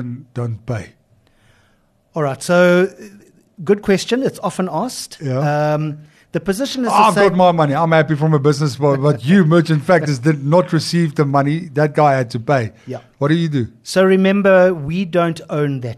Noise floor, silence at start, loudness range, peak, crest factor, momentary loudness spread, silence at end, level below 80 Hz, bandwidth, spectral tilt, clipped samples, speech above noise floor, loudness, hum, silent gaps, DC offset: -58 dBFS; 0 s; 6 LU; -2 dBFS; 14 dB; 13 LU; 0 s; -54 dBFS; 13 kHz; -6.5 dB/octave; under 0.1%; 42 dB; -16 LUFS; none; none; under 0.1%